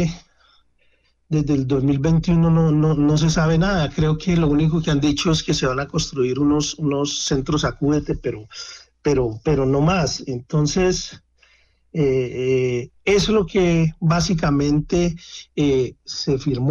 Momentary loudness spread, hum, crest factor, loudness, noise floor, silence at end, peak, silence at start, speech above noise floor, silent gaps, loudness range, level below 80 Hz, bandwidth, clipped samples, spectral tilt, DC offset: 9 LU; none; 12 dB; -20 LUFS; -60 dBFS; 0 s; -8 dBFS; 0 s; 42 dB; none; 4 LU; -36 dBFS; 7.6 kHz; under 0.1%; -6 dB/octave; under 0.1%